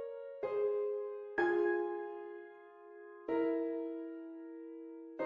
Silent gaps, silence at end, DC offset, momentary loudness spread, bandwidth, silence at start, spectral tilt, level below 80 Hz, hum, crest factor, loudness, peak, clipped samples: none; 0 s; under 0.1%; 18 LU; 5.4 kHz; 0 s; -3.5 dB/octave; -78 dBFS; none; 18 dB; -37 LUFS; -20 dBFS; under 0.1%